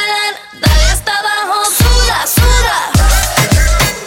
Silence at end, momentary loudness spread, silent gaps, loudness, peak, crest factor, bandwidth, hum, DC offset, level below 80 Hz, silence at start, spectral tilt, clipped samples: 0 s; 4 LU; none; -11 LUFS; 0 dBFS; 10 dB; 17.5 kHz; none; under 0.1%; -14 dBFS; 0 s; -3 dB/octave; under 0.1%